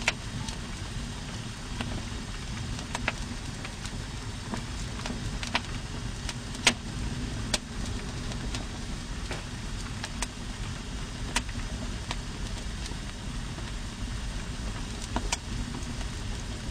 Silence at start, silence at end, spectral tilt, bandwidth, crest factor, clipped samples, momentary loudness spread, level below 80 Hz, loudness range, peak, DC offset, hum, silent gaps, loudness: 0 s; 0 s; -3.5 dB/octave; 15 kHz; 26 dB; under 0.1%; 6 LU; -38 dBFS; 5 LU; -6 dBFS; under 0.1%; none; none; -34 LUFS